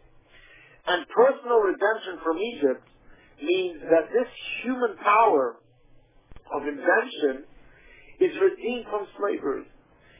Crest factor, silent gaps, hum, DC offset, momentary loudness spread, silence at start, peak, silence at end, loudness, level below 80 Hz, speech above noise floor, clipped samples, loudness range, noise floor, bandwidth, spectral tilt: 18 dB; none; none; under 0.1%; 11 LU; 0.85 s; -8 dBFS; 0.55 s; -25 LUFS; -62 dBFS; 32 dB; under 0.1%; 3 LU; -56 dBFS; 3.8 kHz; -8 dB/octave